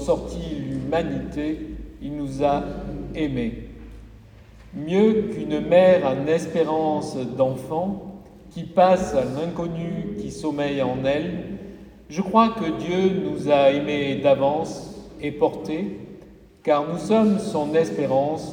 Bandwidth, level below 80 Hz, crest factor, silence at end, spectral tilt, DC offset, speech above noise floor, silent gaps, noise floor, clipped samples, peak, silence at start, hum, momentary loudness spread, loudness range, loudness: 10.5 kHz; -46 dBFS; 20 dB; 0 s; -6.5 dB/octave; under 0.1%; 25 dB; none; -46 dBFS; under 0.1%; -2 dBFS; 0 s; none; 16 LU; 6 LU; -23 LUFS